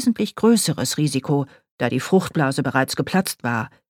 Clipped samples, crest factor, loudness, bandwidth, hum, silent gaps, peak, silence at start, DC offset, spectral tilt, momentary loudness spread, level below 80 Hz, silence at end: under 0.1%; 18 dB; -21 LUFS; 18.5 kHz; none; 1.71-1.78 s; -2 dBFS; 0 s; under 0.1%; -5 dB/octave; 7 LU; -60 dBFS; 0.2 s